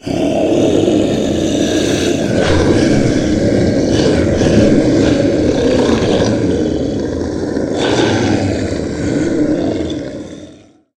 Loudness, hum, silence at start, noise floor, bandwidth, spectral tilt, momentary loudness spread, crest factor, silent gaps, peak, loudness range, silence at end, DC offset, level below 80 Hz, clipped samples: -14 LUFS; none; 0.05 s; -41 dBFS; 12 kHz; -6 dB/octave; 7 LU; 14 dB; none; 0 dBFS; 4 LU; 0.45 s; under 0.1%; -30 dBFS; under 0.1%